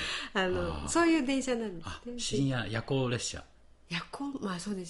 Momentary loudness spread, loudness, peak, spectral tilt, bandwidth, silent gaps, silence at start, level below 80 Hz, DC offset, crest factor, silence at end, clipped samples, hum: 12 LU; -32 LUFS; -14 dBFS; -4.5 dB/octave; 11.5 kHz; none; 0 s; -50 dBFS; under 0.1%; 20 dB; 0 s; under 0.1%; none